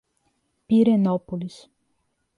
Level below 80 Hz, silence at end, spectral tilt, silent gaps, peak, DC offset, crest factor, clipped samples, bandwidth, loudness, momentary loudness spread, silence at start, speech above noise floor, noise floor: -64 dBFS; 0.9 s; -9 dB/octave; none; -8 dBFS; under 0.1%; 16 dB; under 0.1%; 10.5 kHz; -21 LUFS; 15 LU; 0.7 s; 51 dB; -72 dBFS